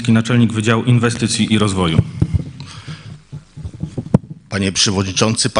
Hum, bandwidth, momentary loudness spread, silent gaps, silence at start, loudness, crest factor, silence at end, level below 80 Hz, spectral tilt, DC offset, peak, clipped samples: none; 10.5 kHz; 19 LU; none; 0 s; -16 LUFS; 16 dB; 0 s; -36 dBFS; -4.5 dB/octave; 0.2%; 0 dBFS; under 0.1%